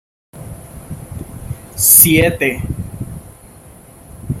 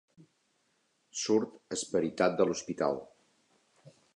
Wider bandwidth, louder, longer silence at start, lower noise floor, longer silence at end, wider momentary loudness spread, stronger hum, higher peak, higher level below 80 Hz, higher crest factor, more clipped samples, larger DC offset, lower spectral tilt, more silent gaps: first, 16.5 kHz vs 10.5 kHz; first, -9 LUFS vs -32 LUFS; second, 0.35 s vs 1.15 s; second, -40 dBFS vs -75 dBFS; second, 0 s vs 0.25 s; first, 27 LU vs 10 LU; neither; first, 0 dBFS vs -12 dBFS; first, -36 dBFS vs -72 dBFS; about the same, 18 dB vs 22 dB; first, 0.2% vs under 0.1%; neither; about the same, -3.5 dB/octave vs -4 dB/octave; neither